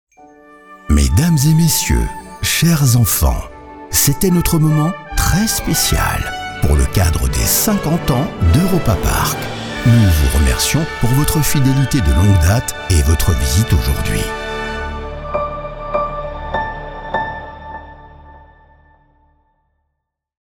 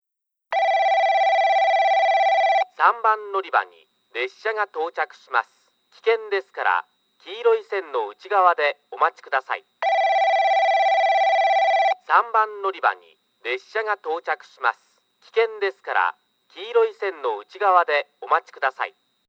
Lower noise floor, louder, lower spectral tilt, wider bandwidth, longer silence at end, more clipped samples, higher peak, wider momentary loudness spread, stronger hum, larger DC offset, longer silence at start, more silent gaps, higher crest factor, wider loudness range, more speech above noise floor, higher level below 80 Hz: about the same, -75 dBFS vs -75 dBFS; first, -15 LUFS vs -21 LUFS; first, -4.5 dB/octave vs -0.5 dB/octave; first, 20 kHz vs 7.4 kHz; first, 2.05 s vs 0.4 s; neither; about the same, 0 dBFS vs -2 dBFS; about the same, 12 LU vs 10 LU; neither; neither; first, 0.7 s vs 0.5 s; neither; about the same, 16 dB vs 20 dB; first, 10 LU vs 7 LU; first, 61 dB vs 52 dB; first, -22 dBFS vs under -90 dBFS